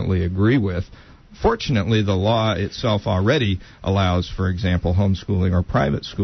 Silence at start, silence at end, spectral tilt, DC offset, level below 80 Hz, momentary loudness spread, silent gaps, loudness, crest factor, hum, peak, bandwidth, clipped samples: 0 s; 0 s; -7 dB/octave; under 0.1%; -36 dBFS; 5 LU; none; -20 LUFS; 14 dB; none; -6 dBFS; 6.4 kHz; under 0.1%